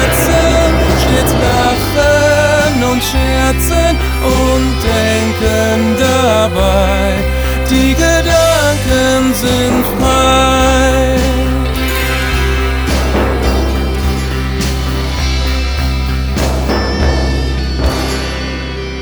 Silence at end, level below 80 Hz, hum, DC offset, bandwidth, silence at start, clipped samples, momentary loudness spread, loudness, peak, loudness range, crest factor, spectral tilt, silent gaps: 0 s; -16 dBFS; none; under 0.1%; over 20 kHz; 0 s; under 0.1%; 6 LU; -12 LUFS; 0 dBFS; 5 LU; 12 dB; -5 dB/octave; none